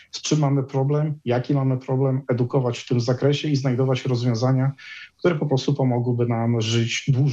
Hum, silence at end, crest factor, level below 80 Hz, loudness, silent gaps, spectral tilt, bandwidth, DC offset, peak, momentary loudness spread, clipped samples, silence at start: none; 0 s; 14 dB; -62 dBFS; -22 LUFS; none; -6.5 dB/octave; 7.8 kHz; under 0.1%; -6 dBFS; 3 LU; under 0.1%; 0.15 s